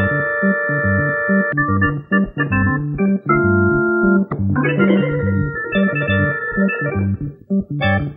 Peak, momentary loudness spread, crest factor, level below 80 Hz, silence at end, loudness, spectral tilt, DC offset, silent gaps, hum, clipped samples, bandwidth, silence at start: -2 dBFS; 5 LU; 14 dB; -40 dBFS; 0 s; -17 LUFS; -12 dB/octave; under 0.1%; none; none; under 0.1%; 5 kHz; 0 s